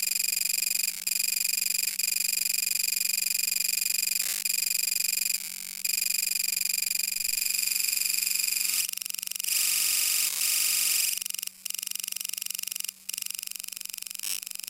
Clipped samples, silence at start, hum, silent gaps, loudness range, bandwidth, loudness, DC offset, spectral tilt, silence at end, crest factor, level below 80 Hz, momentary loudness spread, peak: under 0.1%; 0 s; none; none; 3 LU; 17 kHz; -26 LUFS; under 0.1%; 4 dB/octave; 0 s; 20 dB; -76 dBFS; 10 LU; -8 dBFS